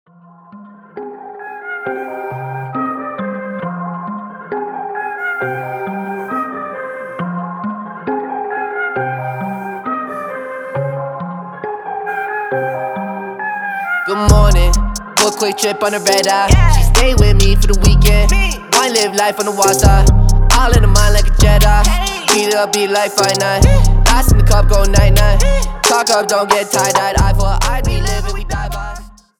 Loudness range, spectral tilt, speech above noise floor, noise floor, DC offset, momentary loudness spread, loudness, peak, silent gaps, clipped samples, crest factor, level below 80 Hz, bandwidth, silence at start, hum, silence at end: 11 LU; -4 dB/octave; 31 dB; -41 dBFS; under 0.1%; 13 LU; -15 LUFS; 0 dBFS; none; under 0.1%; 12 dB; -16 dBFS; 19 kHz; 0.55 s; none; 0.3 s